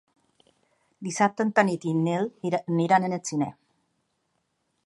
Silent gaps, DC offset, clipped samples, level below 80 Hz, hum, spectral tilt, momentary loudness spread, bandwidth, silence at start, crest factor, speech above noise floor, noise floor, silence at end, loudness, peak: none; under 0.1%; under 0.1%; -74 dBFS; none; -6 dB/octave; 9 LU; 11.5 kHz; 1 s; 24 dB; 50 dB; -75 dBFS; 1.35 s; -25 LUFS; -4 dBFS